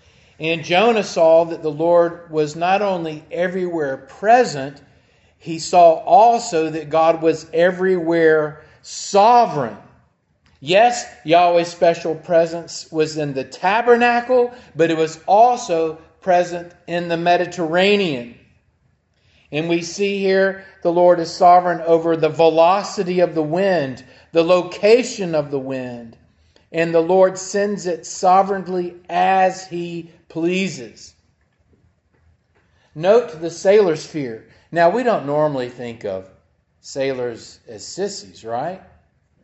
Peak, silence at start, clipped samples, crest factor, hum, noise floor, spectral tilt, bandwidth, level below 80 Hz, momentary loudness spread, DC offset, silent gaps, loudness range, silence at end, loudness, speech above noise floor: 0 dBFS; 0.4 s; under 0.1%; 18 dB; none; -62 dBFS; -5 dB/octave; 8.4 kHz; -64 dBFS; 15 LU; under 0.1%; none; 6 LU; 0.65 s; -17 LUFS; 45 dB